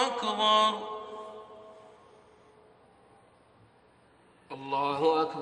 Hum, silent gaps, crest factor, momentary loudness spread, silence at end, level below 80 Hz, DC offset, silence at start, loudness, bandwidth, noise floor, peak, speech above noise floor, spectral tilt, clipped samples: none; none; 20 dB; 25 LU; 0 s; -76 dBFS; under 0.1%; 0 s; -27 LUFS; 10 kHz; -62 dBFS; -12 dBFS; 35 dB; -3.5 dB/octave; under 0.1%